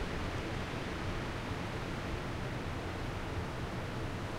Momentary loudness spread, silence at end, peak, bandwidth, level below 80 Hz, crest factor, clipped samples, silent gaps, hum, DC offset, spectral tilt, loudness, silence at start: 1 LU; 0 s; -26 dBFS; 16 kHz; -46 dBFS; 12 dB; under 0.1%; none; none; under 0.1%; -5.5 dB/octave; -39 LUFS; 0 s